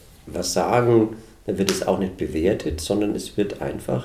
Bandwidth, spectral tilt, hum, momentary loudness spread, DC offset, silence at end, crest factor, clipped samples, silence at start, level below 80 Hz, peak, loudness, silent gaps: 16 kHz; -5.5 dB/octave; none; 10 LU; under 0.1%; 0 s; 22 dB; under 0.1%; 0.25 s; -44 dBFS; -2 dBFS; -23 LUFS; none